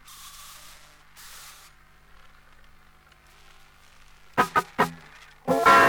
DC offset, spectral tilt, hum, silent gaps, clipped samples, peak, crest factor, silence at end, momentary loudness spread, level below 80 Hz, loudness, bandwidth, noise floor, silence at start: under 0.1%; -3.5 dB/octave; 50 Hz at -60 dBFS; none; under 0.1%; -6 dBFS; 22 dB; 0 s; 25 LU; -56 dBFS; -24 LUFS; over 20 kHz; -55 dBFS; 4.35 s